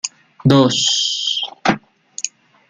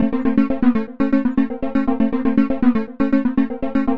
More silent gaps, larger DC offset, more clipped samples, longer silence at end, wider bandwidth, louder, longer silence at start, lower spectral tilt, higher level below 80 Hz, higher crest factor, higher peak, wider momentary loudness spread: neither; second, under 0.1% vs 4%; neither; first, 0.4 s vs 0 s; first, 10 kHz vs 5.2 kHz; first, -16 LUFS vs -19 LUFS; about the same, 0.05 s vs 0 s; second, -4 dB/octave vs -9.5 dB/octave; second, -54 dBFS vs -40 dBFS; about the same, 16 dB vs 14 dB; about the same, -2 dBFS vs -2 dBFS; first, 14 LU vs 4 LU